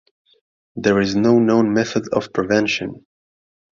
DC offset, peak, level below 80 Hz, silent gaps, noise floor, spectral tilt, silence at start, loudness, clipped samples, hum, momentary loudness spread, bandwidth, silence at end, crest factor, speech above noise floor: under 0.1%; -2 dBFS; -54 dBFS; none; under -90 dBFS; -5.5 dB/octave; 0.75 s; -18 LUFS; under 0.1%; none; 9 LU; 7.4 kHz; 0.8 s; 18 dB; over 73 dB